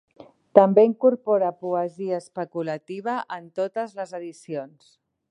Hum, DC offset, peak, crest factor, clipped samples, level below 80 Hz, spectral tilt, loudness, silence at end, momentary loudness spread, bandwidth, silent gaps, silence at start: none; under 0.1%; 0 dBFS; 24 dB; under 0.1%; -76 dBFS; -7.5 dB/octave; -23 LUFS; 0.65 s; 17 LU; 10.5 kHz; none; 0.55 s